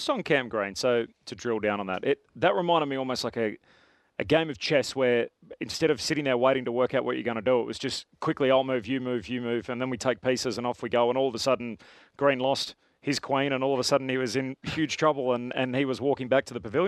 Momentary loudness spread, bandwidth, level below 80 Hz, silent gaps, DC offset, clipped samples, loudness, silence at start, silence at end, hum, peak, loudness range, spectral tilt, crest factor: 7 LU; 13.5 kHz; -64 dBFS; none; under 0.1%; under 0.1%; -27 LUFS; 0 s; 0 s; none; -8 dBFS; 2 LU; -4.5 dB/octave; 18 dB